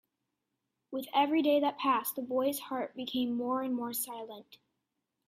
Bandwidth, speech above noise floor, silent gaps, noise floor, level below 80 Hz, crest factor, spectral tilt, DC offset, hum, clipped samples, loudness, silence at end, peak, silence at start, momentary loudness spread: 16 kHz; 53 dB; none; -85 dBFS; -78 dBFS; 18 dB; -3 dB/octave; under 0.1%; none; under 0.1%; -32 LUFS; 0.75 s; -16 dBFS; 0.9 s; 14 LU